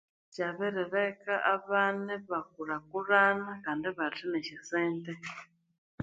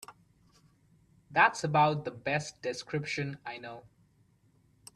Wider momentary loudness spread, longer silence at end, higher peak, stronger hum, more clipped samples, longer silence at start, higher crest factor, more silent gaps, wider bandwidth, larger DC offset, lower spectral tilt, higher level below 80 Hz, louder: second, 12 LU vs 19 LU; second, 0 s vs 1.15 s; about the same, -10 dBFS vs -8 dBFS; neither; neither; first, 0.35 s vs 0.1 s; about the same, 22 dB vs 24 dB; first, 5.78-5.98 s vs none; second, 8 kHz vs 14 kHz; neither; about the same, -5.5 dB/octave vs -4.5 dB/octave; second, -76 dBFS vs -70 dBFS; about the same, -32 LUFS vs -30 LUFS